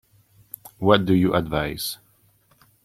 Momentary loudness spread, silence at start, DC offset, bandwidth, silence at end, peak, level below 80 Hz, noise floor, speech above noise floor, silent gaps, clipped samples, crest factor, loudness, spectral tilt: 23 LU; 0.65 s; under 0.1%; 16.5 kHz; 0.9 s; -2 dBFS; -48 dBFS; -60 dBFS; 40 dB; none; under 0.1%; 22 dB; -21 LUFS; -5.5 dB/octave